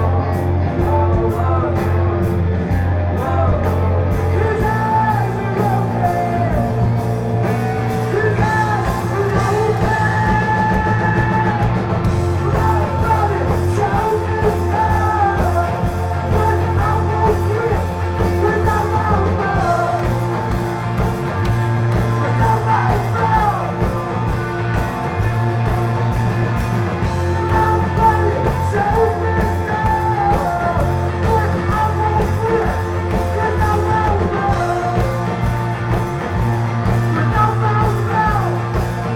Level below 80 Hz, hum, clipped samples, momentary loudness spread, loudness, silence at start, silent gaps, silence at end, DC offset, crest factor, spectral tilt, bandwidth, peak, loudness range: -28 dBFS; none; under 0.1%; 4 LU; -17 LUFS; 0 s; none; 0 s; under 0.1%; 14 dB; -7.5 dB/octave; 15.5 kHz; -2 dBFS; 2 LU